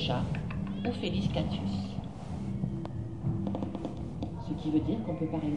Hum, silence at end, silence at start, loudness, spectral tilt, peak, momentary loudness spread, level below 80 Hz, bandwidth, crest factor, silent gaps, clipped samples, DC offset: none; 0 s; 0 s; -34 LUFS; -7.5 dB/octave; -16 dBFS; 8 LU; -48 dBFS; 10.5 kHz; 16 dB; none; under 0.1%; 0.3%